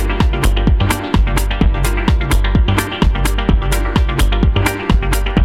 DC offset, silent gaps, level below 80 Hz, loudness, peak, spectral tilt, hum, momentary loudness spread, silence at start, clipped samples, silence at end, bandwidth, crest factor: under 0.1%; none; -14 dBFS; -16 LUFS; 0 dBFS; -5.5 dB/octave; none; 2 LU; 0 s; under 0.1%; 0 s; 15.5 kHz; 12 dB